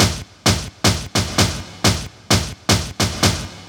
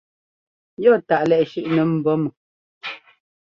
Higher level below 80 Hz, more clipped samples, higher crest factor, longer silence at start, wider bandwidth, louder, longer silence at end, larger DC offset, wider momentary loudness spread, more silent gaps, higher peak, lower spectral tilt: first, -34 dBFS vs -66 dBFS; neither; about the same, 18 dB vs 18 dB; second, 0 s vs 0.8 s; first, over 20 kHz vs 6.6 kHz; about the same, -18 LUFS vs -19 LUFS; second, 0 s vs 0.45 s; neither; second, 3 LU vs 15 LU; second, none vs 2.37-2.81 s; about the same, -2 dBFS vs -4 dBFS; second, -3.5 dB/octave vs -8.5 dB/octave